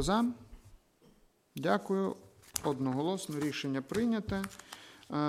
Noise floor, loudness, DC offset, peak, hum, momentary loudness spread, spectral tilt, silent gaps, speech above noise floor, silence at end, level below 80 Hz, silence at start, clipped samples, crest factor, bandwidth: -65 dBFS; -34 LUFS; under 0.1%; -10 dBFS; none; 17 LU; -5 dB/octave; none; 32 dB; 0 s; -56 dBFS; 0 s; under 0.1%; 26 dB; 16 kHz